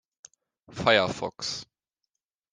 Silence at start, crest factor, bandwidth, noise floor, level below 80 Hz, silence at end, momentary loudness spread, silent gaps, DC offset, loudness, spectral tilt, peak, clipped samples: 0.7 s; 26 dB; 10 kHz; -85 dBFS; -62 dBFS; 0.9 s; 15 LU; none; under 0.1%; -26 LUFS; -3.5 dB/octave; -6 dBFS; under 0.1%